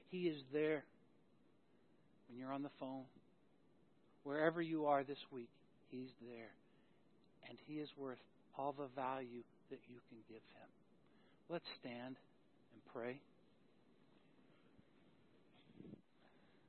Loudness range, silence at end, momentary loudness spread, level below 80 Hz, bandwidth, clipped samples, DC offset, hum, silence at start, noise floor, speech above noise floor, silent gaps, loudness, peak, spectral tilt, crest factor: 14 LU; 0.4 s; 22 LU; under -90 dBFS; 4.3 kHz; under 0.1%; under 0.1%; none; 0.1 s; -75 dBFS; 29 dB; none; -46 LUFS; -22 dBFS; -4.5 dB/octave; 28 dB